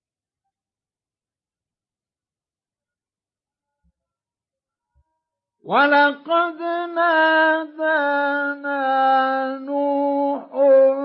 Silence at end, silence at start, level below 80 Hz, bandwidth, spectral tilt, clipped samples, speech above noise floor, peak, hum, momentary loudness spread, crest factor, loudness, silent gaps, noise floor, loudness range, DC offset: 0 s; 5.65 s; -80 dBFS; 5.6 kHz; -7.5 dB/octave; under 0.1%; over 72 dB; -4 dBFS; none; 9 LU; 16 dB; -19 LUFS; none; under -90 dBFS; 5 LU; under 0.1%